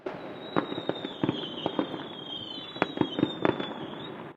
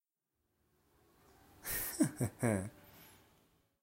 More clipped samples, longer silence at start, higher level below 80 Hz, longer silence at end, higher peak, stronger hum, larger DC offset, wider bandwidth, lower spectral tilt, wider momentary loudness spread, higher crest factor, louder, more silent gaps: neither; second, 0 s vs 1.6 s; about the same, -68 dBFS vs -64 dBFS; second, 0 s vs 0.75 s; first, -4 dBFS vs -18 dBFS; neither; neither; second, 7.8 kHz vs 16 kHz; first, -7 dB/octave vs -5 dB/octave; second, 10 LU vs 23 LU; about the same, 28 dB vs 24 dB; first, -32 LUFS vs -37 LUFS; neither